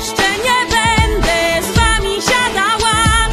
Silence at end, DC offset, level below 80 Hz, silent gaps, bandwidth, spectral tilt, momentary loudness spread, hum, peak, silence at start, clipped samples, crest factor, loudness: 0 s; under 0.1%; -22 dBFS; none; 14 kHz; -3 dB/octave; 2 LU; none; 0 dBFS; 0 s; under 0.1%; 14 dB; -13 LUFS